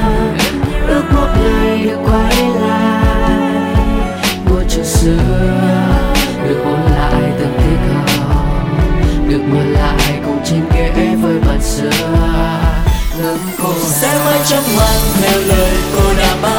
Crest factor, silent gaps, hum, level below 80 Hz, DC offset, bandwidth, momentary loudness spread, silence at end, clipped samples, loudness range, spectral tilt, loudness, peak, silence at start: 12 dB; none; none; -16 dBFS; under 0.1%; 17 kHz; 4 LU; 0 s; under 0.1%; 1 LU; -5 dB/octave; -13 LUFS; 0 dBFS; 0 s